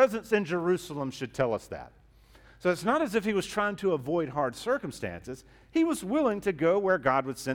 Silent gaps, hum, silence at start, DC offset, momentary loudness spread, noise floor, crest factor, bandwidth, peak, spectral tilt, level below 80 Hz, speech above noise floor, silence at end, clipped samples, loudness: none; none; 0 s; under 0.1%; 12 LU; -57 dBFS; 18 dB; 17.5 kHz; -10 dBFS; -5.5 dB/octave; -58 dBFS; 28 dB; 0 s; under 0.1%; -29 LUFS